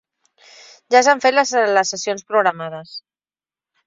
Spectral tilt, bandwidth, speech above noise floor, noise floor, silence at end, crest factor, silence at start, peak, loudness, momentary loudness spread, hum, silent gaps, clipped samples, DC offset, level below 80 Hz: -2 dB/octave; 7.8 kHz; over 73 dB; under -90 dBFS; 0.85 s; 18 dB; 0.9 s; -2 dBFS; -16 LUFS; 18 LU; none; none; under 0.1%; under 0.1%; -72 dBFS